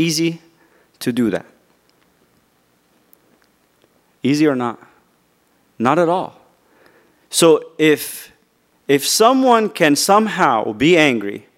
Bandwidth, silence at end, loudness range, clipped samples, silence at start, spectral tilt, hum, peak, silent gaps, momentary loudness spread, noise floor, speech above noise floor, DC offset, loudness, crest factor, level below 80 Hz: 16 kHz; 0.2 s; 13 LU; under 0.1%; 0 s; -4 dB/octave; none; 0 dBFS; none; 14 LU; -60 dBFS; 44 dB; under 0.1%; -16 LUFS; 18 dB; -62 dBFS